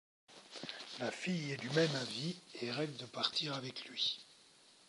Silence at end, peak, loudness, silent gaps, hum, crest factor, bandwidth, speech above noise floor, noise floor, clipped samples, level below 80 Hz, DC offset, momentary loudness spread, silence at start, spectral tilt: 0.2 s; -18 dBFS; -39 LUFS; none; none; 24 dB; 11.5 kHz; 25 dB; -65 dBFS; under 0.1%; -84 dBFS; under 0.1%; 13 LU; 0.3 s; -4 dB/octave